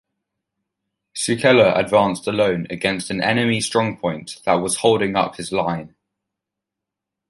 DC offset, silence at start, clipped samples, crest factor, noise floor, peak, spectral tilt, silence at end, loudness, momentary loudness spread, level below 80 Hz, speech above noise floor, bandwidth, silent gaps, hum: under 0.1%; 1.15 s; under 0.1%; 18 dB; -84 dBFS; -2 dBFS; -4.5 dB/octave; 1.4 s; -19 LUFS; 11 LU; -54 dBFS; 65 dB; 12 kHz; none; none